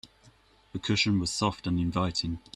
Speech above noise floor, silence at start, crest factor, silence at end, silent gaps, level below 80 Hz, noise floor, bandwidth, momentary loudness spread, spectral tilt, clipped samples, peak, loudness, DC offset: 31 dB; 0.05 s; 18 dB; 0.15 s; none; -52 dBFS; -60 dBFS; 12.5 kHz; 8 LU; -4.5 dB/octave; under 0.1%; -12 dBFS; -28 LUFS; under 0.1%